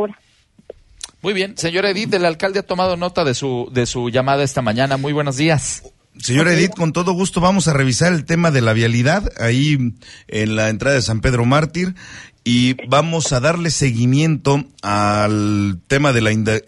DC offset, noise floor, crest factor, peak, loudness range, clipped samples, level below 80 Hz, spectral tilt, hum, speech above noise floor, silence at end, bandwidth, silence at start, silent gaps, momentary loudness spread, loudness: under 0.1%; -54 dBFS; 14 dB; -2 dBFS; 3 LU; under 0.1%; -40 dBFS; -5 dB/octave; none; 37 dB; 0.05 s; 11.5 kHz; 0 s; none; 7 LU; -17 LUFS